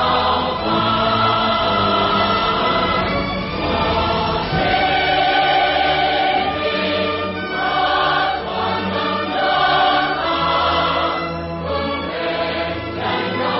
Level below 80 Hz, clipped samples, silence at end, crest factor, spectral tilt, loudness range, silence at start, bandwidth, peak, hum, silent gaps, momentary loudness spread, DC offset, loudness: -38 dBFS; under 0.1%; 0 s; 14 dB; -9 dB/octave; 2 LU; 0 s; 5.8 kHz; -4 dBFS; none; none; 7 LU; under 0.1%; -18 LUFS